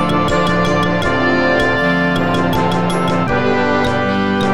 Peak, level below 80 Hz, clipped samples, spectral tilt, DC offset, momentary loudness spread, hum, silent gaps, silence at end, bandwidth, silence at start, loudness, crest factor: 0 dBFS; -34 dBFS; under 0.1%; -6 dB/octave; 4%; 2 LU; none; none; 0 s; 13 kHz; 0 s; -15 LUFS; 14 dB